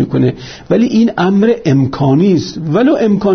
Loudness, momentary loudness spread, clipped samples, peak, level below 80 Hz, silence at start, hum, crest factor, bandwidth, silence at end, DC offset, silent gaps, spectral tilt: -12 LUFS; 5 LU; under 0.1%; 0 dBFS; -44 dBFS; 0 s; none; 10 dB; 6.6 kHz; 0 s; under 0.1%; none; -8 dB/octave